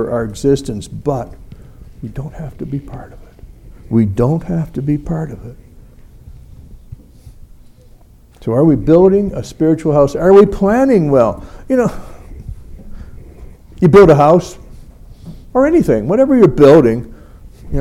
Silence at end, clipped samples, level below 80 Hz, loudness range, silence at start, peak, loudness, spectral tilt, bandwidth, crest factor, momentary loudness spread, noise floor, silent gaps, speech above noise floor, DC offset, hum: 0 s; under 0.1%; -34 dBFS; 13 LU; 0 s; 0 dBFS; -12 LUFS; -8 dB/octave; 13 kHz; 14 dB; 23 LU; -42 dBFS; none; 31 dB; under 0.1%; none